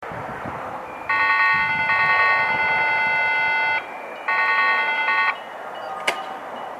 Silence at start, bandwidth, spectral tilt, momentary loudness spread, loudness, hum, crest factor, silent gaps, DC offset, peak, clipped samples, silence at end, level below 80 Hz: 0 s; 14 kHz; -3 dB/octave; 15 LU; -19 LUFS; none; 18 dB; none; under 0.1%; -4 dBFS; under 0.1%; 0 s; -58 dBFS